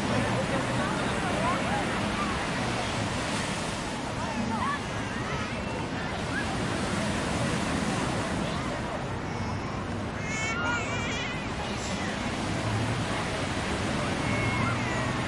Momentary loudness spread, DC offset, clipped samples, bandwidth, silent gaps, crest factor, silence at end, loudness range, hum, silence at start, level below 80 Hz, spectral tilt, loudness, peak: 5 LU; under 0.1%; under 0.1%; 11.5 kHz; none; 16 dB; 0 s; 2 LU; none; 0 s; -44 dBFS; -4.5 dB/octave; -29 LUFS; -14 dBFS